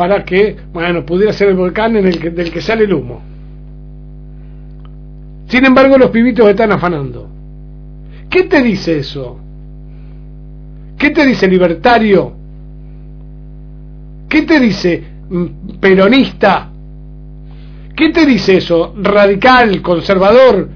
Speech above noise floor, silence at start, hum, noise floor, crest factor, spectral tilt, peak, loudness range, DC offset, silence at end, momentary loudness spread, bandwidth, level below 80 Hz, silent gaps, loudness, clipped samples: 21 dB; 0 s; 50 Hz at -30 dBFS; -30 dBFS; 12 dB; -7 dB/octave; 0 dBFS; 6 LU; under 0.1%; 0 s; 13 LU; 5.4 kHz; -32 dBFS; none; -10 LUFS; 0.5%